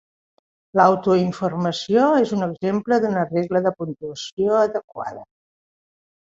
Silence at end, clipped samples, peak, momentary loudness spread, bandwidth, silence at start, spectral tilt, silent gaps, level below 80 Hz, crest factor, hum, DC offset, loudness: 1.05 s; under 0.1%; -2 dBFS; 14 LU; 7.8 kHz; 0.75 s; -6.5 dB/octave; 4.32-4.37 s, 4.84-4.88 s; -62 dBFS; 20 dB; none; under 0.1%; -20 LUFS